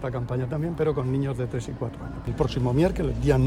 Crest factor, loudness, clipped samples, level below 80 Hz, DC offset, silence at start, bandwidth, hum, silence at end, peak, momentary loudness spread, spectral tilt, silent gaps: 18 dB; -27 LUFS; under 0.1%; -38 dBFS; under 0.1%; 0 s; 11.5 kHz; none; 0 s; -6 dBFS; 10 LU; -8 dB/octave; none